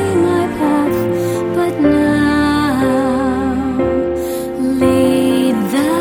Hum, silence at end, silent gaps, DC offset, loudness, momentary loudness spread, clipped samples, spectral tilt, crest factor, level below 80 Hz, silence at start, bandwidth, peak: none; 0 s; none; under 0.1%; -15 LUFS; 5 LU; under 0.1%; -6 dB/octave; 12 dB; -36 dBFS; 0 s; 18 kHz; -2 dBFS